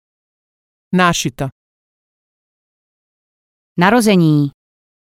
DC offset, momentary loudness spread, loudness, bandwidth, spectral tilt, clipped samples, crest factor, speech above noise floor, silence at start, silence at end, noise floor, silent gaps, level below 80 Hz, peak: under 0.1%; 15 LU; -14 LUFS; 16 kHz; -5.5 dB/octave; under 0.1%; 18 dB; over 77 dB; 0.9 s; 0.7 s; under -90 dBFS; 1.52-3.76 s; -50 dBFS; 0 dBFS